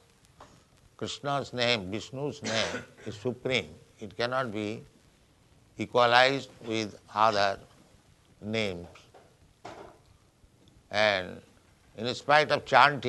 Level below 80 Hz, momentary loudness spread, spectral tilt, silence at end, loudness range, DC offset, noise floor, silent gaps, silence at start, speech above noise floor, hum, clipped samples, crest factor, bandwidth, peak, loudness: -66 dBFS; 22 LU; -4 dB/octave; 0 s; 7 LU; under 0.1%; -62 dBFS; none; 0.4 s; 34 dB; none; under 0.1%; 26 dB; 12 kHz; -4 dBFS; -28 LUFS